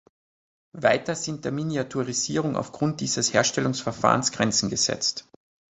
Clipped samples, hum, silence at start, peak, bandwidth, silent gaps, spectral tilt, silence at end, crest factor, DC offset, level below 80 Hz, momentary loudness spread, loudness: under 0.1%; none; 0.75 s; -2 dBFS; 8.4 kHz; none; -3.5 dB/octave; 0.55 s; 24 dB; under 0.1%; -58 dBFS; 7 LU; -24 LUFS